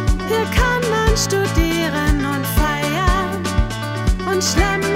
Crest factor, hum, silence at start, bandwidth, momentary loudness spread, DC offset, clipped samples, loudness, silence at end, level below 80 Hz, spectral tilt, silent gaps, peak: 14 dB; none; 0 s; 16 kHz; 4 LU; under 0.1%; under 0.1%; -18 LUFS; 0 s; -22 dBFS; -4.5 dB/octave; none; -2 dBFS